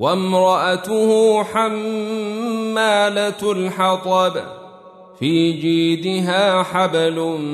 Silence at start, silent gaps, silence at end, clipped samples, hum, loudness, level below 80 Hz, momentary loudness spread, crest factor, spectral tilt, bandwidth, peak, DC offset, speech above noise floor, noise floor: 0 s; none; 0 s; under 0.1%; none; -18 LUFS; -64 dBFS; 8 LU; 14 dB; -5 dB/octave; 13.5 kHz; -4 dBFS; under 0.1%; 25 dB; -42 dBFS